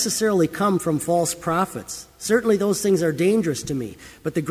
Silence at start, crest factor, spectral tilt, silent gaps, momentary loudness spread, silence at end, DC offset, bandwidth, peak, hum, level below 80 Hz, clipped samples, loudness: 0 s; 16 dB; -5 dB/octave; none; 11 LU; 0 s; under 0.1%; 16 kHz; -6 dBFS; none; -54 dBFS; under 0.1%; -22 LUFS